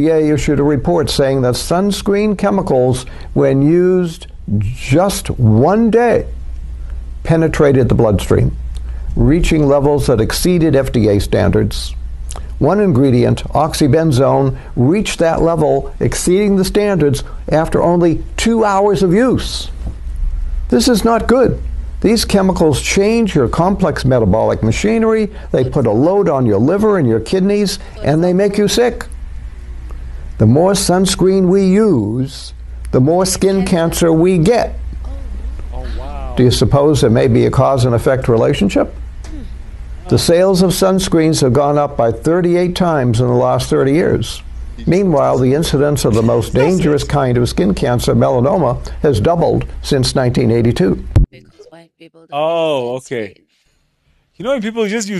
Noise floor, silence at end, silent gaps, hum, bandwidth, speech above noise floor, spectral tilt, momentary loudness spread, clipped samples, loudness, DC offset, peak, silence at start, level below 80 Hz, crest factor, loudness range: -59 dBFS; 0 s; none; none; 12.5 kHz; 47 dB; -6 dB/octave; 15 LU; under 0.1%; -13 LUFS; under 0.1%; -2 dBFS; 0 s; -26 dBFS; 12 dB; 2 LU